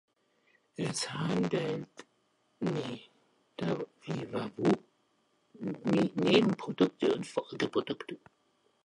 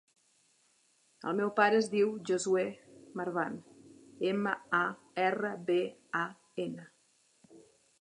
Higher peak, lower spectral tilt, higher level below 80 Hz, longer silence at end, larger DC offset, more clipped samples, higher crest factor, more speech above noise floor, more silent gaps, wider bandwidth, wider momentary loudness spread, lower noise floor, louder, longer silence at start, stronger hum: about the same, -10 dBFS vs -12 dBFS; about the same, -5.5 dB/octave vs -5 dB/octave; first, -72 dBFS vs -84 dBFS; first, 0.7 s vs 0.4 s; neither; neither; about the same, 24 dB vs 22 dB; about the same, 42 dB vs 39 dB; neither; about the same, 11.5 kHz vs 11 kHz; about the same, 15 LU vs 13 LU; about the same, -73 dBFS vs -70 dBFS; about the same, -32 LUFS vs -33 LUFS; second, 0.8 s vs 1.25 s; neither